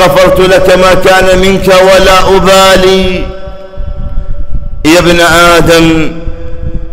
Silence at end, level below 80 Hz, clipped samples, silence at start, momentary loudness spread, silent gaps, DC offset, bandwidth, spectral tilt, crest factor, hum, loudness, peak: 0 s; -16 dBFS; 0.3%; 0 s; 18 LU; none; under 0.1%; 16.5 kHz; -4.5 dB/octave; 6 dB; none; -4 LUFS; 0 dBFS